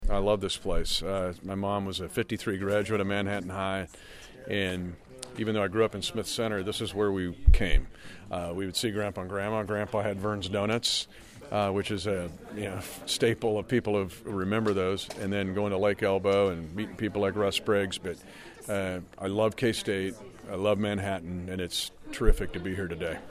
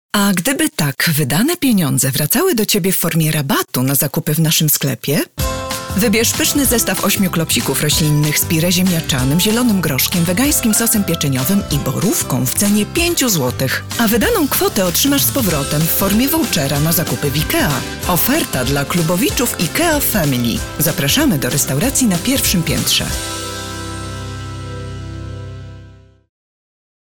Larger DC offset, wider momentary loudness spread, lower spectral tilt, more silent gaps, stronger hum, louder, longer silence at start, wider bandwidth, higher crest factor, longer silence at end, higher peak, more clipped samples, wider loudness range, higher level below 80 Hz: second, under 0.1% vs 0.4%; about the same, 10 LU vs 8 LU; about the same, -5 dB/octave vs -4 dB/octave; neither; neither; second, -30 LUFS vs -15 LUFS; second, 0 s vs 0.15 s; second, 15.5 kHz vs over 20 kHz; first, 24 dB vs 12 dB; second, 0 s vs 1.1 s; about the same, -6 dBFS vs -4 dBFS; neither; about the same, 3 LU vs 3 LU; about the same, -36 dBFS vs -34 dBFS